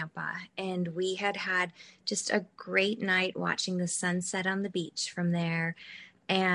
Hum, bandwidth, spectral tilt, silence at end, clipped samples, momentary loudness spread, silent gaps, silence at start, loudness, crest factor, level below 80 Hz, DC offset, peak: none; 11.5 kHz; -4 dB/octave; 0 s; under 0.1%; 9 LU; none; 0 s; -31 LUFS; 22 dB; -74 dBFS; under 0.1%; -10 dBFS